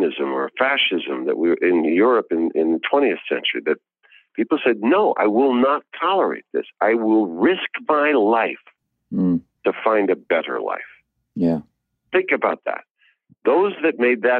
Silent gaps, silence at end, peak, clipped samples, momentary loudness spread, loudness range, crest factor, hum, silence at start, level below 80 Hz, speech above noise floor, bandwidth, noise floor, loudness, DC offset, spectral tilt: 12.91-12.95 s; 0 s; -4 dBFS; under 0.1%; 10 LU; 4 LU; 16 dB; none; 0 s; -70 dBFS; 39 dB; 4.8 kHz; -58 dBFS; -20 LUFS; under 0.1%; -8.5 dB/octave